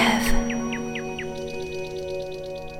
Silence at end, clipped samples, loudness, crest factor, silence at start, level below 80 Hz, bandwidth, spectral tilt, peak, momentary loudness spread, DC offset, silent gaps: 0 s; under 0.1%; -28 LUFS; 18 dB; 0 s; -34 dBFS; 16.5 kHz; -4 dB/octave; -8 dBFS; 9 LU; 0.2%; none